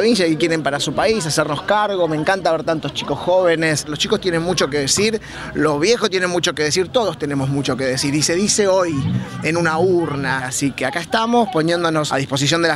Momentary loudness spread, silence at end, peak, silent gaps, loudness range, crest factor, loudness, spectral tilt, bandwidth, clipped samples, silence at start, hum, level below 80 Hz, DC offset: 5 LU; 0 s; -2 dBFS; none; 1 LU; 16 dB; -18 LUFS; -4 dB/octave; 15.5 kHz; under 0.1%; 0 s; none; -48 dBFS; under 0.1%